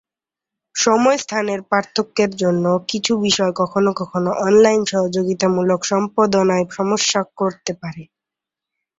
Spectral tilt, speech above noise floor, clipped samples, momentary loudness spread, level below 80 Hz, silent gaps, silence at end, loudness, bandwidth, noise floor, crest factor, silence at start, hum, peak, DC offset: -4 dB/octave; 70 dB; under 0.1%; 8 LU; -60 dBFS; none; 0.95 s; -18 LUFS; 8 kHz; -87 dBFS; 16 dB; 0.75 s; none; -2 dBFS; under 0.1%